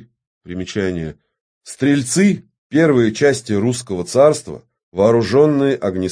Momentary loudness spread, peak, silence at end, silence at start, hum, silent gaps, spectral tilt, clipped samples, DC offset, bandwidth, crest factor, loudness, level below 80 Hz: 16 LU; 0 dBFS; 0 s; 0.45 s; none; 1.41-1.61 s, 2.58-2.70 s, 4.83-4.92 s; -5.5 dB/octave; under 0.1%; under 0.1%; 10.5 kHz; 16 dB; -16 LUFS; -52 dBFS